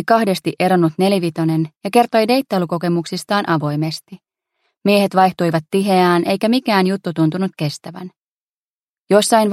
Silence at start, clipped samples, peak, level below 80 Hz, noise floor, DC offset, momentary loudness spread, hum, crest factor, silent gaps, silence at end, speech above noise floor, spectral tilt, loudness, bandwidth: 0 s; under 0.1%; 0 dBFS; -64 dBFS; under -90 dBFS; under 0.1%; 9 LU; none; 16 dB; 1.77-1.81 s, 4.77-4.81 s, 8.22-8.83 s, 8.90-9.05 s; 0 s; over 74 dB; -5.5 dB/octave; -17 LUFS; 16 kHz